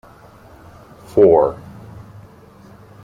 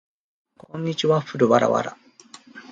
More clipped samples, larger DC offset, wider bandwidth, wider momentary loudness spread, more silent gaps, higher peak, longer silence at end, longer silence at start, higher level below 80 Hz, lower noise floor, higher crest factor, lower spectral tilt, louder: neither; neither; first, 9.6 kHz vs 8 kHz; first, 27 LU vs 18 LU; neither; about the same, -2 dBFS vs -4 dBFS; first, 1.5 s vs 0.1 s; first, 1.15 s vs 0.75 s; first, -50 dBFS vs -66 dBFS; second, -44 dBFS vs -48 dBFS; about the same, 18 dB vs 20 dB; first, -9 dB/octave vs -6 dB/octave; first, -14 LUFS vs -21 LUFS